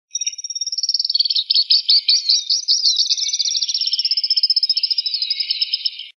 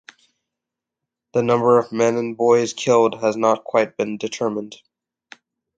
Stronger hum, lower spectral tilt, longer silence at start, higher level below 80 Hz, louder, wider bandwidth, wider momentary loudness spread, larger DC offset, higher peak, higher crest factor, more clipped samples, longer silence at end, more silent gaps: neither; second, 11.5 dB/octave vs -5 dB/octave; second, 0.15 s vs 1.35 s; second, under -90 dBFS vs -68 dBFS; first, -15 LUFS vs -19 LUFS; first, 10.5 kHz vs 8.8 kHz; about the same, 8 LU vs 9 LU; neither; about the same, -2 dBFS vs -4 dBFS; about the same, 16 dB vs 18 dB; neither; second, 0.05 s vs 1 s; neither